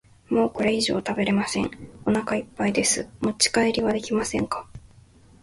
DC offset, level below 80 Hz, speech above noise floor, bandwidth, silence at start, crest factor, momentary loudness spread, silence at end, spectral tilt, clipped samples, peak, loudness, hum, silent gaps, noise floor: under 0.1%; -52 dBFS; 28 dB; 12 kHz; 0.3 s; 18 dB; 8 LU; 0.65 s; -3.5 dB/octave; under 0.1%; -6 dBFS; -24 LUFS; none; none; -52 dBFS